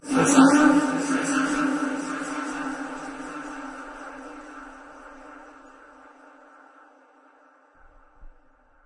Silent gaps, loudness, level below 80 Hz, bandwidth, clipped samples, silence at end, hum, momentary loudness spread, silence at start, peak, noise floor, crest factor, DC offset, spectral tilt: none; -23 LUFS; -58 dBFS; 11.5 kHz; under 0.1%; 0.55 s; none; 28 LU; 0.05 s; -2 dBFS; -57 dBFS; 24 dB; under 0.1%; -4 dB/octave